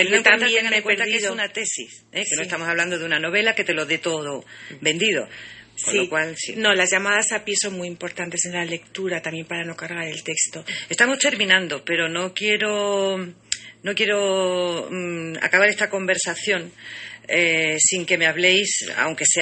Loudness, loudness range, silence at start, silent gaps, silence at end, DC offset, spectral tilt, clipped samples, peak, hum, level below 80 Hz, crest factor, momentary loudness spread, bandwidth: -20 LUFS; 4 LU; 0 s; none; 0 s; under 0.1%; -1.5 dB/octave; under 0.1%; 0 dBFS; none; -68 dBFS; 22 dB; 12 LU; 8.8 kHz